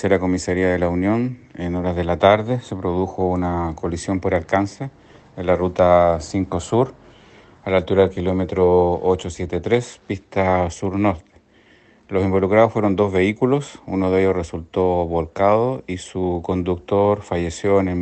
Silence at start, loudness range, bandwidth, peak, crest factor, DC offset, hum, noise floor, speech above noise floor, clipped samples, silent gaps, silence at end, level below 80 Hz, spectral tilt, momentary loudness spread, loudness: 0 s; 2 LU; 8.8 kHz; 0 dBFS; 20 dB; under 0.1%; none; -53 dBFS; 34 dB; under 0.1%; none; 0 s; -48 dBFS; -7 dB/octave; 10 LU; -20 LUFS